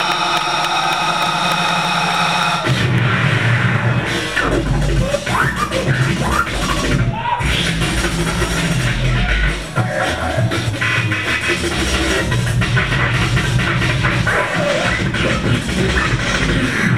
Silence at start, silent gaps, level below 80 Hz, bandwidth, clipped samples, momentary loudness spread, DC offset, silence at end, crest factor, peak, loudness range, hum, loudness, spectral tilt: 0 s; none; -26 dBFS; 15.5 kHz; under 0.1%; 3 LU; 0.7%; 0 s; 14 dB; -2 dBFS; 2 LU; none; -16 LUFS; -4.5 dB/octave